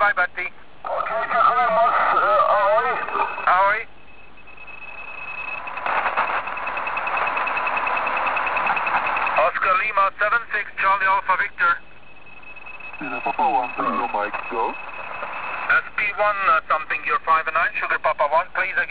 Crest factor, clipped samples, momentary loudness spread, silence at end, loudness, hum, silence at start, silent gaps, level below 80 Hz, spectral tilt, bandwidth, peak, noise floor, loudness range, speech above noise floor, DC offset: 16 dB; under 0.1%; 13 LU; 0 s; -21 LUFS; none; 0 s; none; -56 dBFS; -6.5 dB/octave; 4 kHz; -6 dBFS; -48 dBFS; 6 LU; 26 dB; 1%